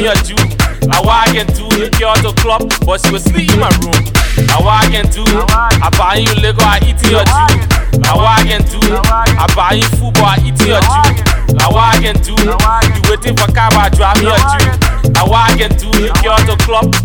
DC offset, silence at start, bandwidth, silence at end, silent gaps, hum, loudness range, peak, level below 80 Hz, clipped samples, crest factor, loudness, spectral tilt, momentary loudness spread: 0.2%; 0 s; 19.5 kHz; 0 s; none; none; 1 LU; 0 dBFS; -16 dBFS; under 0.1%; 8 dB; -10 LUFS; -4.5 dB/octave; 4 LU